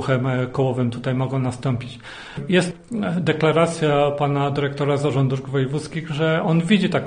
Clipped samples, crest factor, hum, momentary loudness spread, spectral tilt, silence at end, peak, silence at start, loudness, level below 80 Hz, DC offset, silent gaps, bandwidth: under 0.1%; 16 dB; none; 9 LU; -6.5 dB/octave; 0 s; -4 dBFS; 0 s; -21 LUFS; -52 dBFS; under 0.1%; none; 10 kHz